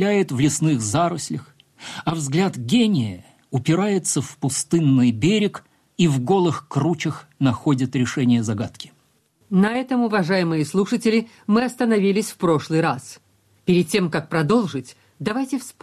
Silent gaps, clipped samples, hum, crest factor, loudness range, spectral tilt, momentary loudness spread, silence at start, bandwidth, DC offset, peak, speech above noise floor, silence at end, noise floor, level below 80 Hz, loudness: none; under 0.1%; none; 12 dB; 2 LU; -5.5 dB/octave; 11 LU; 0 s; 14.5 kHz; under 0.1%; -8 dBFS; 42 dB; 0.1 s; -62 dBFS; -58 dBFS; -21 LUFS